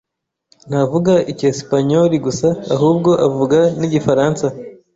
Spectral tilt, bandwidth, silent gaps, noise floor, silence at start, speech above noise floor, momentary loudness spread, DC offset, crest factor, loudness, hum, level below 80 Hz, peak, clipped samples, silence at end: -7 dB/octave; 8 kHz; none; -58 dBFS; 0.65 s; 44 dB; 5 LU; under 0.1%; 14 dB; -15 LUFS; none; -50 dBFS; 0 dBFS; under 0.1%; 0.2 s